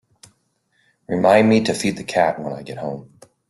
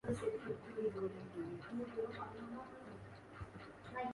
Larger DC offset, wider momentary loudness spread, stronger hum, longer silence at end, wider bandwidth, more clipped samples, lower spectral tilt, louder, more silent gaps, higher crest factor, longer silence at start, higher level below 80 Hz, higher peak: neither; first, 16 LU vs 12 LU; neither; first, 0.45 s vs 0 s; about the same, 12.5 kHz vs 11.5 kHz; neither; second, -5.5 dB/octave vs -7 dB/octave; first, -19 LUFS vs -46 LUFS; neither; about the same, 18 dB vs 18 dB; first, 1.1 s vs 0.05 s; first, -60 dBFS vs -66 dBFS; first, -2 dBFS vs -26 dBFS